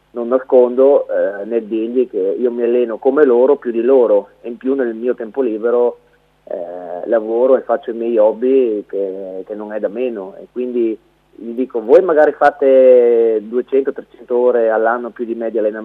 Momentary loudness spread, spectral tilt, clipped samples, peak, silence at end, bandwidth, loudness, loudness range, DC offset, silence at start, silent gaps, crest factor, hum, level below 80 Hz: 15 LU; -8 dB/octave; under 0.1%; 0 dBFS; 0 s; 4.3 kHz; -15 LUFS; 6 LU; under 0.1%; 0.15 s; none; 14 dB; none; -62 dBFS